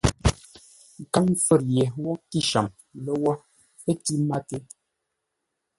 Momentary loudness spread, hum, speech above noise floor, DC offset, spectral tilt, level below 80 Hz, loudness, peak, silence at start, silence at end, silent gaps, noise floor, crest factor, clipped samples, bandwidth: 16 LU; none; 56 dB; under 0.1%; -5 dB/octave; -40 dBFS; -25 LUFS; -4 dBFS; 0.05 s; 1.2 s; none; -80 dBFS; 22 dB; under 0.1%; 12 kHz